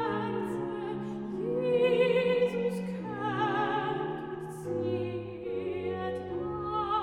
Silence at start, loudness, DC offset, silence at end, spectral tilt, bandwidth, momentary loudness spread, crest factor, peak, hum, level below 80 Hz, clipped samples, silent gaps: 0 s; -31 LUFS; under 0.1%; 0 s; -7 dB/octave; 12 kHz; 11 LU; 16 dB; -16 dBFS; none; -60 dBFS; under 0.1%; none